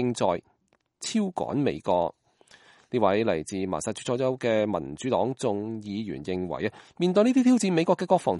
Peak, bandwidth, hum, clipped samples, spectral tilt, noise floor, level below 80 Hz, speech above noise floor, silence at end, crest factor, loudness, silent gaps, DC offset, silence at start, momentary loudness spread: -8 dBFS; 11.5 kHz; none; under 0.1%; -5.5 dB/octave; -68 dBFS; -62 dBFS; 42 dB; 0 s; 18 dB; -26 LUFS; none; under 0.1%; 0 s; 11 LU